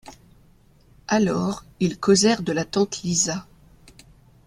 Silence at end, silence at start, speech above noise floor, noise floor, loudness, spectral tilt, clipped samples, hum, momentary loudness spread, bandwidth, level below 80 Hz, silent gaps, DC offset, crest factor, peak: 1.05 s; 0.05 s; 33 dB; -55 dBFS; -22 LUFS; -4 dB/octave; under 0.1%; none; 10 LU; 13 kHz; -54 dBFS; none; under 0.1%; 20 dB; -4 dBFS